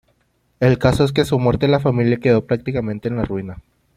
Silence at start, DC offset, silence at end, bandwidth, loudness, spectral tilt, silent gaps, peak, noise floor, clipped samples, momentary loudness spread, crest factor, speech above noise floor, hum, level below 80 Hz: 0.6 s; under 0.1%; 0.35 s; 14.5 kHz; -18 LUFS; -7.5 dB/octave; none; -2 dBFS; -63 dBFS; under 0.1%; 8 LU; 16 dB; 46 dB; none; -40 dBFS